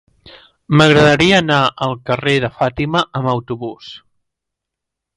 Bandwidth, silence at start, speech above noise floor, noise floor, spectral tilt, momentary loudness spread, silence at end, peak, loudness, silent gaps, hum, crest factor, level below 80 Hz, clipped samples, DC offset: 11.5 kHz; 0.25 s; 66 dB; -81 dBFS; -5.5 dB/octave; 16 LU; 1.2 s; 0 dBFS; -14 LUFS; none; none; 16 dB; -44 dBFS; under 0.1%; under 0.1%